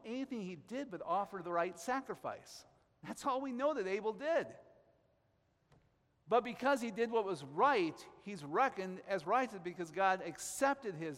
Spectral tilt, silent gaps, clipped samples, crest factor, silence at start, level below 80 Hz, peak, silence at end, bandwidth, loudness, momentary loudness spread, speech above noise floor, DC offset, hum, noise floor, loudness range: -4.5 dB/octave; none; under 0.1%; 20 dB; 0.05 s; -78 dBFS; -18 dBFS; 0 s; 16 kHz; -37 LUFS; 12 LU; 39 dB; under 0.1%; none; -76 dBFS; 5 LU